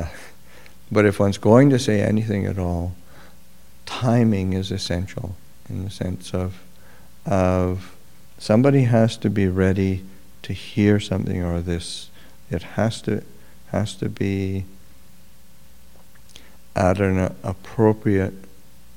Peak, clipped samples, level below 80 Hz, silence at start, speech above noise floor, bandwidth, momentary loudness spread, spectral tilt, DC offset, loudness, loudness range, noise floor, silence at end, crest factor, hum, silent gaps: 0 dBFS; under 0.1%; -46 dBFS; 0 s; 32 dB; 16.5 kHz; 16 LU; -7 dB/octave; 1%; -21 LUFS; 7 LU; -52 dBFS; 0.5 s; 22 dB; none; none